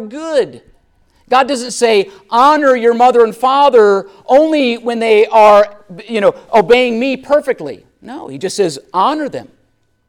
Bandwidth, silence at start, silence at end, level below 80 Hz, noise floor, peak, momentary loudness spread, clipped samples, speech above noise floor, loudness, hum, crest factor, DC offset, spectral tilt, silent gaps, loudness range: 15 kHz; 0 s; 0.65 s; -52 dBFS; -58 dBFS; 0 dBFS; 14 LU; under 0.1%; 46 dB; -12 LUFS; none; 12 dB; under 0.1%; -4 dB/octave; none; 5 LU